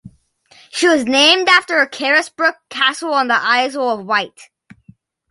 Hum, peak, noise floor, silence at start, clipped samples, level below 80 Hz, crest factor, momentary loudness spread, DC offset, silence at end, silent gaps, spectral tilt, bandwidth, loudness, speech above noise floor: none; 0 dBFS; -51 dBFS; 0.05 s; under 0.1%; -64 dBFS; 16 dB; 8 LU; under 0.1%; 0.85 s; none; -1.5 dB/octave; 11.5 kHz; -14 LUFS; 36 dB